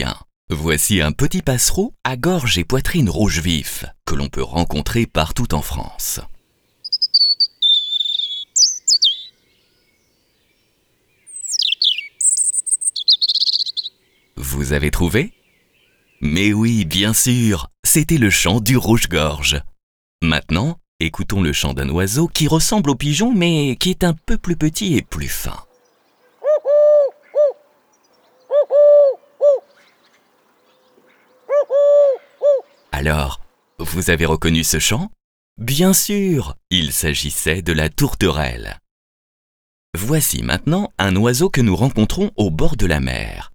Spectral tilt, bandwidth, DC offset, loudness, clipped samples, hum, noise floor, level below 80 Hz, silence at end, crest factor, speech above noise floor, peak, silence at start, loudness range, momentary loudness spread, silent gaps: -3.5 dB/octave; over 20 kHz; under 0.1%; -16 LUFS; under 0.1%; none; -62 dBFS; -30 dBFS; 0.05 s; 16 dB; 45 dB; 0 dBFS; 0 s; 5 LU; 12 LU; 0.36-0.48 s, 17.79-17.83 s, 19.83-20.19 s, 20.88-20.99 s, 35.24-35.56 s, 38.91-39.93 s